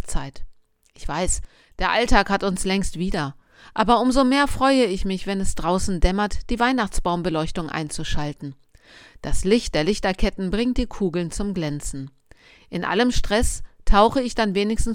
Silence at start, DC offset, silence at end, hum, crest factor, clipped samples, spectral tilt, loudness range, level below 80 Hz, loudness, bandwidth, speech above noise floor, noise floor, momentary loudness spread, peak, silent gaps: 0 s; under 0.1%; 0 s; none; 20 dB; under 0.1%; -4.5 dB/octave; 5 LU; -30 dBFS; -22 LUFS; 15.5 kHz; 31 dB; -51 dBFS; 13 LU; -2 dBFS; none